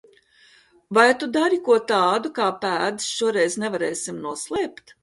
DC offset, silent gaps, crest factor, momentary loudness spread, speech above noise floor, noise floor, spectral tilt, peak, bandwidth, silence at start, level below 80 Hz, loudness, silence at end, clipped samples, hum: under 0.1%; none; 20 dB; 10 LU; 34 dB; -55 dBFS; -3 dB/octave; -2 dBFS; 11.5 kHz; 0.9 s; -66 dBFS; -22 LUFS; 0.3 s; under 0.1%; none